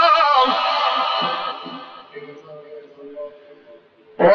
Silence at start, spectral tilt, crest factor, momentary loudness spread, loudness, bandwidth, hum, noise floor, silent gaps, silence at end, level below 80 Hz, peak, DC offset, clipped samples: 0 s; -0.5 dB/octave; 18 dB; 24 LU; -17 LUFS; 7.2 kHz; none; -48 dBFS; none; 0 s; -66 dBFS; -2 dBFS; under 0.1%; under 0.1%